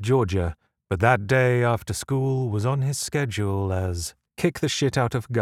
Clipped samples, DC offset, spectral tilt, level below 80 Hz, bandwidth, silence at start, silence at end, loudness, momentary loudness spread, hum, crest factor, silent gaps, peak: under 0.1%; under 0.1%; -5.5 dB/octave; -46 dBFS; 15 kHz; 0 s; 0 s; -24 LUFS; 7 LU; none; 20 dB; none; -4 dBFS